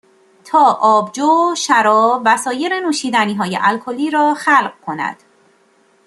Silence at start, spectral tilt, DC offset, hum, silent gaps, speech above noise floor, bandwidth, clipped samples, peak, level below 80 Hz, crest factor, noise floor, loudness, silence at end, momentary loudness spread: 0.45 s; -3.5 dB/octave; under 0.1%; none; none; 40 dB; 12.5 kHz; under 0.1%; -2 dBFS; -68 dBFS; 14 dB; -54 dBFS; -15 LUFS; 0.9 s; 9 LU